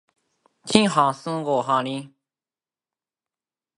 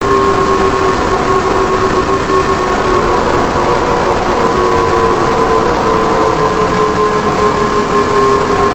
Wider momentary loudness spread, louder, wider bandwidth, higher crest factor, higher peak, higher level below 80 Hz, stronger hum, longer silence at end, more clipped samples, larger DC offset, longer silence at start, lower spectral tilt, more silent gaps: first, 14 LU vs 1 LU; second, -22 LUFS vs -12 LUFS; second, 11.5 kHz vs over 20 kHz; first, 26 dB vs 12 dB; about the same, 0 dBFS vs 0 dBFS; second, -64 dBFS vs -28 dBFS; neither; first, 1.7 s vs 0 s; neither; neither; first, 0.65 s vs 0 s; about the same, -4.5 dB/octave vs -5.5 dB/octave; neither